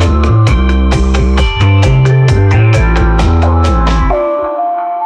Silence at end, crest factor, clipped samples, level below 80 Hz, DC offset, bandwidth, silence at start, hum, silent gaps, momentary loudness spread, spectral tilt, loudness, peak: 0 s; 8 dB; under 0.1%; -12 dBFS; under 0.1%; 9.4 kHz; 0 s; none; none; 5 LU; -7 dB/octave; -10 LUFS; 0 dBFS